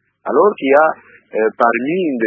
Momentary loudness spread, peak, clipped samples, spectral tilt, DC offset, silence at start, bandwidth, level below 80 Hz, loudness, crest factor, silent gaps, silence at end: 8 LU; 0 dBFS; under 0.1%; -8 dB/octave; under 0.1%; 0.25 s; 4.9 kHz; -68 dBFS; -15 LUFS; 16 dB; none; 0 s